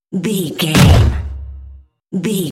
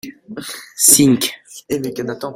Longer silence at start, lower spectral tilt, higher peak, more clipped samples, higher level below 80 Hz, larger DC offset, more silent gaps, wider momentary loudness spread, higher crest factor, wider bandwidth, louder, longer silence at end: about the same, 0.1 s vs 0.05 s; first, -5.5 dB/octave vs -3 dB/octave; about the same, 0 dBFS vs 0 dBFS; neither; first, -24 dBFS vs -56 dBFS; neither; neither; second, 19 LU vs 22 LU; about the same, 14 dB vs 18 dB; second, 17 kHz vs over 20 kHz; about the same, -14 LUFS vs -14 LUFS; about the same, 0 s vs 0 s